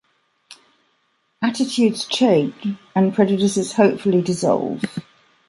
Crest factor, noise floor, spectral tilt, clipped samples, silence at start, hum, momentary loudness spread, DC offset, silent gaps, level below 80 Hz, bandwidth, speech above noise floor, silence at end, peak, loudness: 18 dB; -66 dBFS; -5.5 dB/octave; under 0.1%; 1.4 s; none; 9 LU; under 0.1%; none; -64 dBFS; 11.5 kHz; 48 dB; 0.5 s; -2 dBFS; -19 LUFS